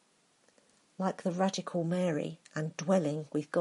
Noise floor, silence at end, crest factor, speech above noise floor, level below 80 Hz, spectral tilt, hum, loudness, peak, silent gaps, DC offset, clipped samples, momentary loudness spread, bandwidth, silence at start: -69 dBFS; 0 s; 18 dB; 37 dB; -80 dBFS; -6 dB/octave; none; -33 LUFS; -14 dBFS; none; under 0.1%; under 0.1%; 7 LU; 11.5 kHz; 1 s